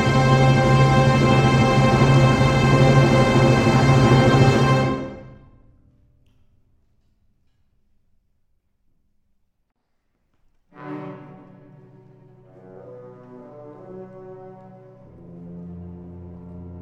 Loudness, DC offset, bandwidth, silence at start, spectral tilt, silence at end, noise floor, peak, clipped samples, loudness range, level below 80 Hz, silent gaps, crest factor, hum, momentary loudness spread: -16 LUFS; under 0.1%; 10 kHz; 0 s; -6.5 dB/octave; 0 s; -70 dBFS; -2 dBFS; under 0.1%; 25 LU; -38 dBFS; none; 18 dB; none; 25 LU